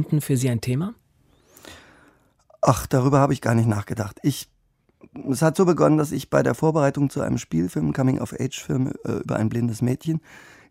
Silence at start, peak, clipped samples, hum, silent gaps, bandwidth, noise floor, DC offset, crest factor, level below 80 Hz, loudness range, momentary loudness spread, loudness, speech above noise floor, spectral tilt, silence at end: 0 s; -2 dBFS; under 0.1%; none; none; 16 kHz; -63 dBFS; under 0.1%; 22 dB; -50 dBFS; 3 LU; 10 LU; -22 LUFS; 41 dB; -7 dB/octave; 0.35 s